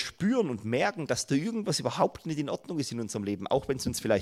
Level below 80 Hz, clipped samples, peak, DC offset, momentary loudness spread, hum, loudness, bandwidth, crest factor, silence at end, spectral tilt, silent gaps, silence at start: -60 dBFS; under 0.1%; -10 dBFS; under 0.1%; 6 LU; none; -30 LUFS; 15.5 kHz; 20 dB; 0 s; -5 dB/octave; none; 0 s